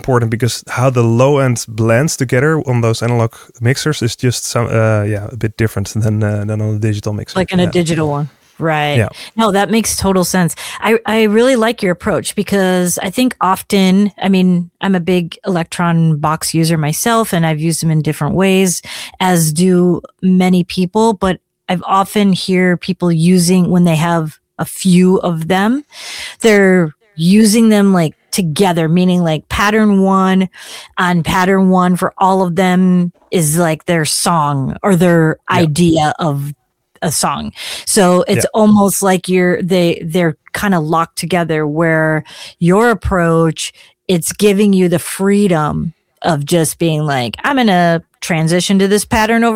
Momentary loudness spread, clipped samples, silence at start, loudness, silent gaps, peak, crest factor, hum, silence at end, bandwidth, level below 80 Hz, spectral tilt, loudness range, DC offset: 8 LU; under 0.1%; 0.05 s; -13 LUFS; none; 0 dBFS; 12 dB; none; 0 s; 16.5 kHz; -42 dBFS; -5.5 dB/octave; 3 LU; under 0.1%